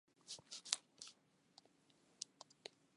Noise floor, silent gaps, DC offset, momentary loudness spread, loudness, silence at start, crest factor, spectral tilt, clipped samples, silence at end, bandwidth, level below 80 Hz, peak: -75 dBFS; none; under 0.1%; 25 LU; -49 LUFS; 0.25 s; 42 dB; 1.5 dB/octave; under 0.1%; 0.25 s; 11.5 kHz; under -90 dBFS; -12 dBFS